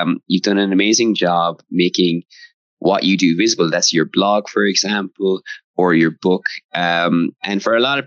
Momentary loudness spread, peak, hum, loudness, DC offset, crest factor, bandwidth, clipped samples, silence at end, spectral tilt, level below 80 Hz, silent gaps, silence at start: 6 LU; -4 dBFS; none; -16 LUFS; under 0.1%; 14 dB; 7.8 kHz; under 0.1%; 0 s; -4 dB/octave; -70 dBFS; 2.54-2.77 s, 5.64-5.74 s, 6.64-6.69 s; 0 s